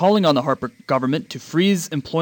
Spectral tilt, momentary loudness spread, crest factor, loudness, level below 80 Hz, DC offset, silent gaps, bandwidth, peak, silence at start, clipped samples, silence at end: -5.5 dB/octave; 8 LU; 16 dB; -20 LUFS; -60 dBFS; under 0.1%; none; 19 kHz; -4 dBFS; 0 s; under 0.1%; 0 s